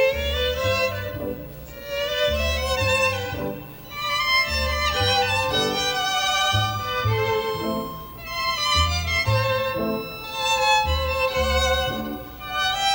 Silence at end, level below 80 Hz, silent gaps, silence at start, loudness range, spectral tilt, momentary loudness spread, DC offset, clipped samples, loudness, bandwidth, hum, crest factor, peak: 0 s; -34 dBFS; none; 0 s; 3 LU; -3.5 dB/octave; 11 LU; under 0.1%; under 0.1%; -22 LUFS; 16.5 kHz; none; 16 dB; -8 dBFS